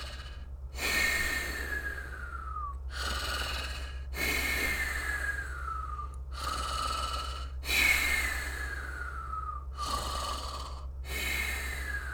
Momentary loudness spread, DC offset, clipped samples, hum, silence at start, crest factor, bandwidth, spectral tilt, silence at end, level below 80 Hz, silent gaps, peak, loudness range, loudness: 13 LU; under 0.1%; under 0.1%; none; 0 s; 20 dB; 19 kHz; -2.5 dB/octave; 0 s; -40 dBFS; none; -14 dBFS; 5 LU; -32 LUFS